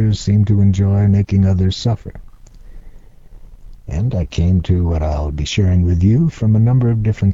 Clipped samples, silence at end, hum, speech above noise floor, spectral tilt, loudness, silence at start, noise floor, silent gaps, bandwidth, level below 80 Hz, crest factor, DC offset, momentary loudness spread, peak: under 0.1%; 0 s; none; 24 dB; -7.5 dB/octave; -15 LUFS; 0 s; -37 dBFS; none; 7.6 kHz; -28 dBFS; 12 dB; under 0.1%; 7 LU; -2 dBFS